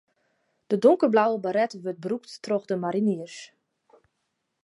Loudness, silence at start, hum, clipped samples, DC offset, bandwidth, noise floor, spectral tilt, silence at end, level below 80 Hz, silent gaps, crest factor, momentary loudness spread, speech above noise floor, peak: -25 LUFS; 0.7 s; none; under 0.1%; under 0.1%; 11.5 kHz; -78 dBFS; -6.5 dB/octave; 1.2 s; -80 dBFS; none; 20 dB; 13 LU; 54 dB; -6 dBFS